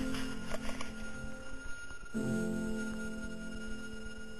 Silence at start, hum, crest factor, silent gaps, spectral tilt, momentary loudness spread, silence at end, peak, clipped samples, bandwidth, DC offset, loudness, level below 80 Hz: 0 s; none; 16 dB; none; -5 dB/octave; 11 LU; 0 s; -20 dBFS; under 0.1%; 13.5 kHz; 0.7%; -41 LUFS; -50 dBFS